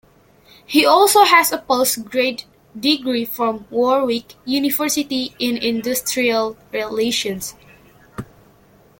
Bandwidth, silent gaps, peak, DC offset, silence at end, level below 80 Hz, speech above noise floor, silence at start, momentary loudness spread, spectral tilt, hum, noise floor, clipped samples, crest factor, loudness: 17 kHz; none; 0 dBFS; under 0.1%; 0.75 s; -56 dBFS; 33 dB; 0.7 s; 14 LU; -2 dB/octave; none; -51 dBFS; under 0.1%; 18 dB; -17 LUFS